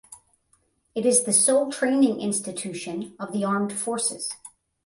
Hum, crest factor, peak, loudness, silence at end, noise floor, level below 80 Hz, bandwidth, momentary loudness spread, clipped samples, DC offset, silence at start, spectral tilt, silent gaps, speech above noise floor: none; 20 dB; -6 dBFS; -23 LUFS; 0.4 s; -67 dBFS; -70 dBFS; 11.5 kHz; 15 LU; under 0.1%; under 0.1%; 0.1 s; -3.5 dB/octave; none; 43 dB